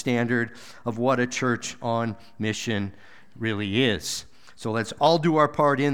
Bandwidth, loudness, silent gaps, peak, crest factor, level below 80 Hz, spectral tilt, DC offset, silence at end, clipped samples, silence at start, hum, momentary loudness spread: 17.5 kHz; -25 LUFS; none; -6 dBFS; 20 dB; -60 dBFS; -5 dB/octave; 0.5%; 0 s; under 0.1%; 0 s; none; 12 LU